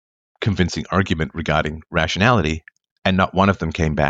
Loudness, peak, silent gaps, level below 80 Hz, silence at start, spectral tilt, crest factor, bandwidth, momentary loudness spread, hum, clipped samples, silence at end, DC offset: -20 LUFS; -2 dBFS; 2.91-3.02 s; -36 dBFS; 0.4 s; -6 dB/octave; 18 dB; 8 kHz; 8 LU; none; under 0.1%; 0 s; under 0.1%